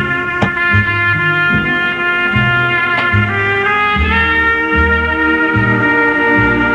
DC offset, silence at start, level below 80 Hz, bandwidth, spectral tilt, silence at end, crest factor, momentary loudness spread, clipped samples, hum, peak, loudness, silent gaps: under 0.1%; 0 s; -30 dBFS; 9.6 kHz; -7 dB/octave; 0 s; 12 dB; 3 LU; under 0.1%; none; 0 dBFS; -12 LUFS; none